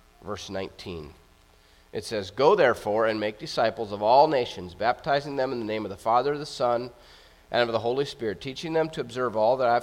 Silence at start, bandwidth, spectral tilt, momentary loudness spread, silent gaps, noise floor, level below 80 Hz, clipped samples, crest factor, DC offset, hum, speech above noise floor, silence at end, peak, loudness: 0.25 s; 15.5 kHz; -5 dB/octave; 15 LU; none; -57 dBFS; -58 dBFS; under 0.1%; 20 dB; under 0.1%; none; 32 dB; 0 s; -6 dBFS; -26 LUFS